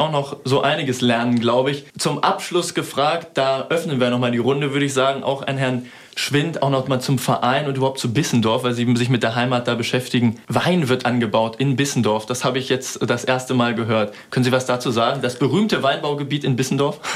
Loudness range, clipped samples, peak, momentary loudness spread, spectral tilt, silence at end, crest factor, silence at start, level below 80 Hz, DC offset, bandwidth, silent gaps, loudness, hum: 1 LU; under 0.1%; -4 dBFS; 4 LU; -5 dB/octave; 0 s; 16 dB; 0 s; -62 dBFS; under 0.1%; 15.5 kHz; none; -20 LUFS; none